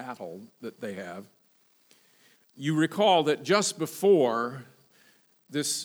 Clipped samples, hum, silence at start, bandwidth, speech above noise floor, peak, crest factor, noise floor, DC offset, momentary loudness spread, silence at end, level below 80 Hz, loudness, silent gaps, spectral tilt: under 0.1%; none; 0 s; over 20 kHz; 38 dB; -8 dBFS; 20 dB; -65 dBFS; under 0.1%; 20 LU; 0 s; -88 dBFS; -26 LUFS; none; -4 dB/octave